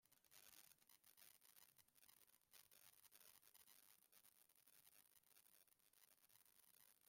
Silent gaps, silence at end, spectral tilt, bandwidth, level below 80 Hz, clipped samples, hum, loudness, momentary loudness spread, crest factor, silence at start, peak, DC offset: none; 0 s; 0 dB/octave; 16.5 kHz; under -90 dBFS; under 0.1%; none; -69 LUFS; 2 LU; 28 dB; 0 s; -46 dBFS; under 0.1%